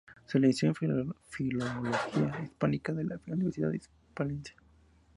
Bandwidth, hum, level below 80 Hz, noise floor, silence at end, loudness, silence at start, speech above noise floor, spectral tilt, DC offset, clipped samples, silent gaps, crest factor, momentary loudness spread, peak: 11.5 kHz; none; -62 dBFS; -63 dBFS; 0.65 s; -32 LUFS; 0.3 s; 31 dB; -7 dB/octave; under 0.1%; under 0.1%; none; 20 dB; 11 LU; -14 dBFS